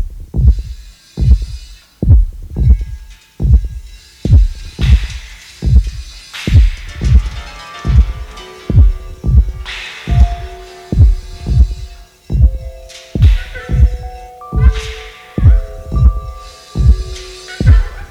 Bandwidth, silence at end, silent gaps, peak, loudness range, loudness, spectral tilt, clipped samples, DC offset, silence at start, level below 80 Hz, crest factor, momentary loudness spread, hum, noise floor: 9 kHz; 0.05 s; none; 0 dBFS; 1 LU; -14 LUFS; -7 dB/octave; 0.8%; under 0.1%; 0 s; -14 dBFS; 12 dB; 18 LU; none; -31 dBFS